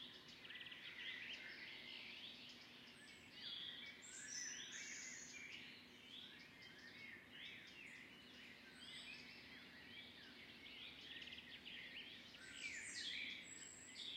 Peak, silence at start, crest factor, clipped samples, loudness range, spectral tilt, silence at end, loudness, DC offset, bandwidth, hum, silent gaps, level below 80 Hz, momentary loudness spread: -36 dBFS; 0 s; 20 dB; under 0.1%; 5 LU; -0.5 dB/octave; 0 s; -53 LUFS; under 0.1%; 16 kHz; none; none; -84 dBFS; 10 LU